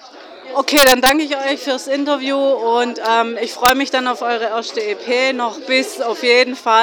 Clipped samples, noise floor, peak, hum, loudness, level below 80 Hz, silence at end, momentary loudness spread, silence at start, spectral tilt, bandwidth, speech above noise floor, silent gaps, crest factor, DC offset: under 0.1%; -37 dBFS; 0 dBFS; none; -16 LUFS; -48 dBFS; 0 s; 10 LU; 0 s; -1 dB/octave; over 20 kHz; 21 dB; none; 16 dB; under 0.1%